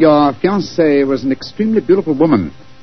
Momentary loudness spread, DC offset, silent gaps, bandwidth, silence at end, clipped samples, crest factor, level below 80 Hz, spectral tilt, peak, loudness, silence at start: 6 LU; 1%; none; 6.4 kHz; 0.3 s; under 0.1%; 12 dB; -48 dBFS; -7.5 dB/octave; 0 dBFS; -14 LUFS; 0 s